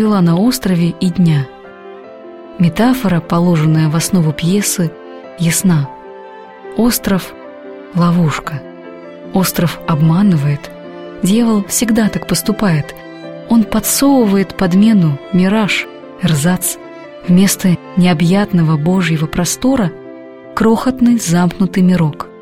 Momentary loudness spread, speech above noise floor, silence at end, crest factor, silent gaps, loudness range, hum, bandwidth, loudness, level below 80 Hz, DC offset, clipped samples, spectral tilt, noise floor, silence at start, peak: 21 LU; 21 dB; 0 s; 12 dB; none; 4 LU; none; 16.5 kHz; -13 LUFS; -40 dBFS; 0.5%; under 0.1%; -5.5 dB/octave; -33 dBFS; 0 s; -2 dBFS